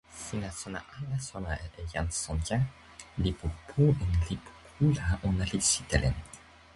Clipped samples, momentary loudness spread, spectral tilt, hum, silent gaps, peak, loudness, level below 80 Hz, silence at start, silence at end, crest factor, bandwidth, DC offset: under 0.1%; 14 LU; -4.5 dB/octave; none; none; -12 dBFS; -31 LUFS; -40 dBFS; 0.1 s; 0.35 s; 20 dB; 11.5 kHz; under 0.1%